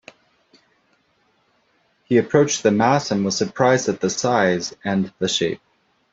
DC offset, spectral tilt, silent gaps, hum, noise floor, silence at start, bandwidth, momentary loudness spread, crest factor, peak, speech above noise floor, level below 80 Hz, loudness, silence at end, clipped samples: under 0.1%; -4.5 dB/octave; none; none; -64 dBFS; 2.1 s; 8 kHz; 7 LU; 20 dB; -2 dBFS; 45 dB; -60 dBFS; -19 LUFS; 0.55 s; under 0.1%